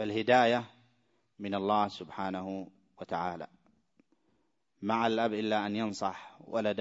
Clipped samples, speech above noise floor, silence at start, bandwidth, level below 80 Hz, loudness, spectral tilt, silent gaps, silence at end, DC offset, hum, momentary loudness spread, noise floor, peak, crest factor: under 0.1%; 45 dB; 0 s; 8 kHz; -76 dBFS; -32 LUFS; -5.5 dB/octave; none; 0 s; under 0.1%; none; 19 LU; -77 dBFS; -10 dBFS; 22 dB